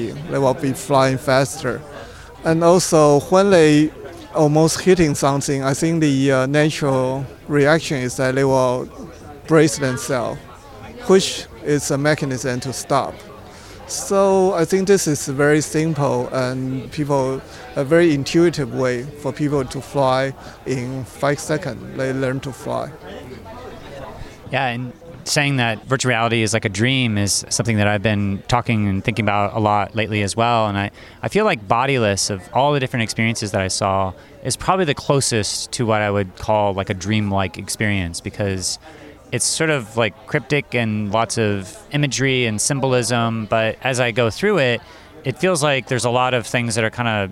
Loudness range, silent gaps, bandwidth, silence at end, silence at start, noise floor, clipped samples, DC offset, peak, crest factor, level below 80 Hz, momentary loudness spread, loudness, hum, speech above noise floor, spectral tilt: 6 LU; none; 16.5 kHz; 0 s; 0 s; -38 dBFS; under 0.1%; under 0.1%; 0 dBFS; 18 dB; -48 dBFS; 12 LU; -19 LUFS; none; 20 dB; -4.5 dB/octave